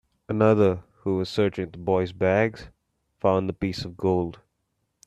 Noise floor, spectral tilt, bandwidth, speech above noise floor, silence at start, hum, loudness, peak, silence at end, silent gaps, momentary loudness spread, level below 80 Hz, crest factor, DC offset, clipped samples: -76 dBFS; -7.5 dB/octave; 11.5 kHz; 52 dB; 0.3 s; none; -25 LUFS; -6 dBFS; 0.7 s; none; 10 LU; -54 dBFS; 18 dB; under 0.1%; under 0.1%